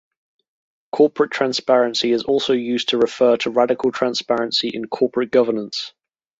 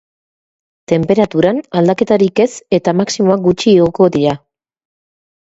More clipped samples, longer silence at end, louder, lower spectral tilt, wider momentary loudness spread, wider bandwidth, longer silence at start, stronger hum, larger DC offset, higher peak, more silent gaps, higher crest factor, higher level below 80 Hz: neither; second, 0.5 s vs 1.2 s; second, -19 LUFS vs -13 LUFS; second, -4 dB/octave vs -6.5 dB/octave; about the same, 7 LU vs 5 LU; about the same, 8 kHz vs 8 kHz; about the same, 0.95 s vs 0.9 s; neither; neither; about the same, -2 dBFS vs 0 dBFS; neither; about the same, 18 dB vs 14 dB; second, -64 dBFS vs -48 dBFS